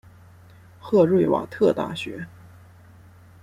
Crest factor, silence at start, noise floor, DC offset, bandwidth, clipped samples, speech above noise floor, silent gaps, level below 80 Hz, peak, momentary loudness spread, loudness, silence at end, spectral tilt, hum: 18 dB; 0.85 s; -49 dBFS; under 0.1%; 13.5 kHz; under 0.1%; 28 dB; none; -62 dBFS; -6 dBFS; 20 LU; -22 LUFS; 1.15 s; -7.5 dB/octave; none